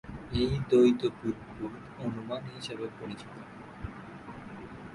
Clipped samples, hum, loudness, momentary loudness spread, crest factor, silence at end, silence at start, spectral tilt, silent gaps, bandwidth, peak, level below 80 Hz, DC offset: under 0.1%; none; -31 LUFS; 21 LU; 20 dB; 0 s; 0.05 s; -7 dB/octave; none; 11.5 kHz; -12 dBFS; -50 dBFS; under 0.1%